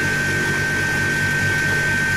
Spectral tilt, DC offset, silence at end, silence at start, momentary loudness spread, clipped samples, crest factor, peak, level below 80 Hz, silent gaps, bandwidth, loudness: -3.5 dB/octave; under 0.1%; 0 s; 0 s; 1 LU; under 0.1%; 14 dB; -6 dBFS; -42 dBFS; none; 16 kHz; -18 LUFS